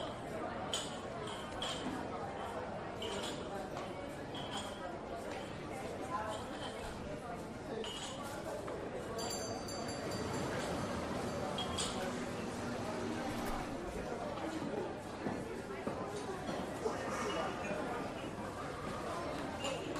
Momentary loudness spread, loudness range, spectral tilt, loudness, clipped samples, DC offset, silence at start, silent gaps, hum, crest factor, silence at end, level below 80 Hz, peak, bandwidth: 5 LU; 4 LU; -4 dB/octave; -41 LUFS; under 0.1%; under 0.1%; 0 s; none; none; 18 dB; 0 s; -58 dBFS; -24 dBFS; 14.5 kHz